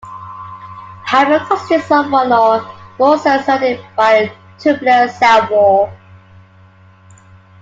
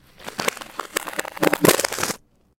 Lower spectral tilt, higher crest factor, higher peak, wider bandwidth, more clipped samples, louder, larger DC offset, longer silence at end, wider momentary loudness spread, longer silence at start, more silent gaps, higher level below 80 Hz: first, -5 dB/octave vs -3 dB/octave; second, 14 dB vs 24 dB; about the same, 0 dBFS vs 0 dBFS; second, 7.8 kHz vs 17 kHz; neither; first, -13 LUFS vs -22 LUFS; neither; first, 1.65 s vs 0.45 s; first, 20 LU vs 16 LU; second, 0.05 s vs 0.2 s; neither; about the same, -56 dBFS vs -58 dBFS